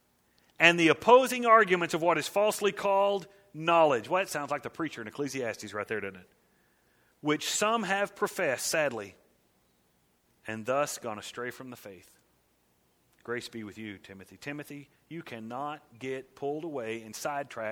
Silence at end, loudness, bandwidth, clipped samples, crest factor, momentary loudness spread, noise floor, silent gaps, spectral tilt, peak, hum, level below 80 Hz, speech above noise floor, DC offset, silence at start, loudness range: 0 s; -28 LUFS; 18.5 kHz; under 0.1%; 26 dB; 21 LU; -70 dBFS; none; -3.5 dB/octave; -4 dBFS; none; -74 dBFS; 41 dB; under 0.1%; 0.6 s; 17 LU